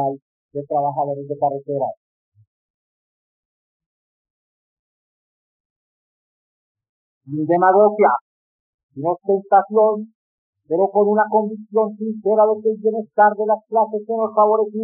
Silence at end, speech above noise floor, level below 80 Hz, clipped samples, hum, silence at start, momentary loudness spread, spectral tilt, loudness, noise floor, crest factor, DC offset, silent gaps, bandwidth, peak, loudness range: 0 s; over 72 dB; -86 dBFS; under 0.1%; none; 0 s; 11 LU; -8.5 dB/octave; -18 LUFS; under -90 dBFS; 16 dB; under 0.1%; 0.22-0.49 s, 1.97-2.32 s, 2.47-3.80 s, 3.86-6.75 s, 6.89-7.21 s, 8.21-8.89 s, 10.15-10.53 s; 2.7 kHz; -4 dBFS; 11 LU